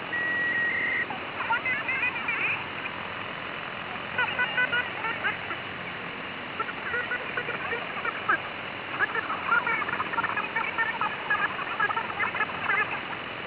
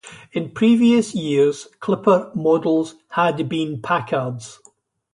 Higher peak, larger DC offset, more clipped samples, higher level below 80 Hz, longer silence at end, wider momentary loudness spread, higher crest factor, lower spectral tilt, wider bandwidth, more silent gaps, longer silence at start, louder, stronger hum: second, -14 dBFS vs -4 dBFS; neither; neither; about the same, -62 dBFS vs -62 dBFS; second, 0 s vs 0.6 s; second, 9 LU vs 13 LU; about the same, 16 dB vs 16 dB; second, -0.5 dB/octave vs -6 dB/octave; second, 4 kHz vs 11 kHz; neither; about the same, 0 s vs 0.05 s; second, -28 LUFS vs -19 LUFS; neither